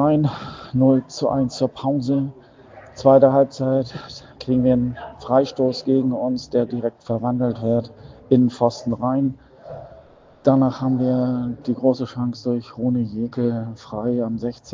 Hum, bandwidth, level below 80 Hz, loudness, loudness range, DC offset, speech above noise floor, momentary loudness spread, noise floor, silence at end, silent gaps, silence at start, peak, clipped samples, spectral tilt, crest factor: none; 7.6 kHz; -52 dBFS; -21 LUFS; 4 LU; under 0.1%; 28 dB; 12 LU; -48 dBFS; 0 s; none; 0 s; 0 dBFS; under 0.1%; -8 dB/octave; 20 dB